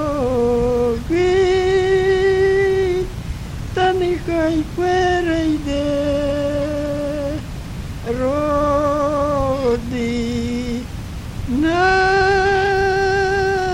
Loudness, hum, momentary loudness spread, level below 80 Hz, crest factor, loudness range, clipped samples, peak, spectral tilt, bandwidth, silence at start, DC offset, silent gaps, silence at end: -18 LUFS; none; 11 LU; -32 dBFS; 14 dB; 3 LU; under 0.1%; -4 dBFS; -6 dB/octave; 14 kHz; 0 s; under 0.1%; none; 0 s